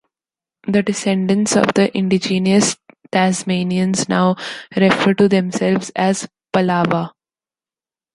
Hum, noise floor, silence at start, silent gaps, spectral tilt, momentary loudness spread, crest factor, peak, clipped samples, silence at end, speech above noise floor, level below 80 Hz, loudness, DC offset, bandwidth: none; under -90 dBFS; 0.65 s; none; -5 dB/octave; 8 LU; 16 dB; -2 dBFS; under 0.1%; 1.05 s; over 74 dB; -56 dBFS; -17 LUFS; under 0.1%; 11.5 kHz